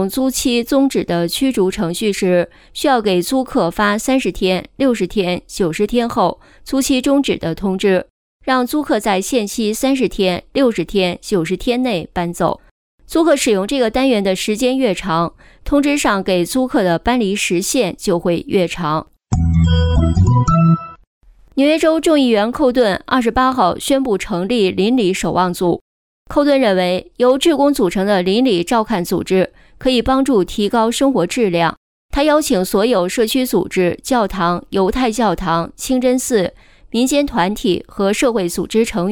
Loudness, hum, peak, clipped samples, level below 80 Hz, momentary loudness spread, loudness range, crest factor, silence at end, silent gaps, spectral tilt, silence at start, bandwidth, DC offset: -16 LUFS; none; -2 dBFS; under 0.1%; -32 dBFS; 6 LU; 2 LU; 12 dB; 0 s; 8.10-8.40 s, 12.71-12.98 s, 21.07-21.21 s, 25.81-26.25 s, 31.77-32.09 s; -5 dB/octave; 0 s; 19 kHz; under 0.1%